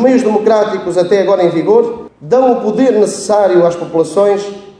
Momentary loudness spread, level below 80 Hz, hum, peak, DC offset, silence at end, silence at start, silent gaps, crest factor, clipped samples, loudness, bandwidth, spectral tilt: 5 LU; -54 dBFS; none; 0 dBFS; under 0.1%; 0.1 s; 0 s; none; 10 dB; under 0.1%; -11 LUFS; 11 kHz; -5.5 dB/octave